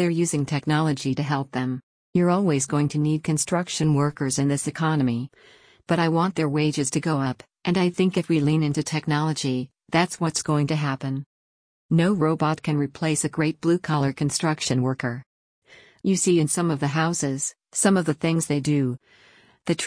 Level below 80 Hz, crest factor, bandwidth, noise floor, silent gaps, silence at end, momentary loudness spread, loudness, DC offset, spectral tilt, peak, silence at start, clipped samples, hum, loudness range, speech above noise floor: -60 dBFS; 16 dB; 10.5 kHz; -50 dBFS; 1.83-2.13 s, 11.26-11.89 s, 15.26-15.62 s; 0 s; 8 LU; -23 LUFS; under 0.1%; -5 dB/octave; -8 dBFS; 0 s; under 0.1%; none; 2 LU; 27 dB